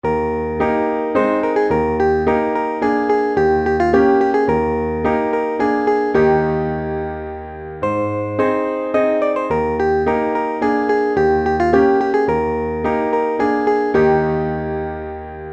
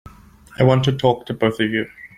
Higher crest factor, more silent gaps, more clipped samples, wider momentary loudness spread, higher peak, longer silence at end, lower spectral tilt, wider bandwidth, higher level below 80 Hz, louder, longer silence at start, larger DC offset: about the same, 14 dB vs 18 dB; neither; neither; about the same, 8 LU vs 6 LU; about the same, -2 dBFS vs -2 dBFS; about the same, 0 s vs 0.1 s; about the same, -8 dB/octave vs -7 dB/octave; second, 7.4 kHz vs 11 kHz; first, -38 dBFS vs -50 dBFS; about the same, -17 LUFS vs -19 LUFS; second, 0.05 s vs 0.55 s; neither